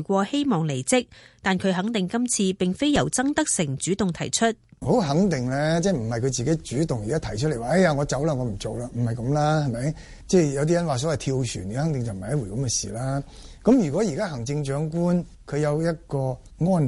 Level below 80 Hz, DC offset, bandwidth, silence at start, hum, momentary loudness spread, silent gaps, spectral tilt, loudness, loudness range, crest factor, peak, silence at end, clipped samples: -46 dBFS; under 0.1%; 11.5 kHz; 0 s; none; 8 LU; none; -5.5 dB/octave; -24 LUFS; 2 LU; 16 dB; -6 dBFS; 0 s; under 0.1%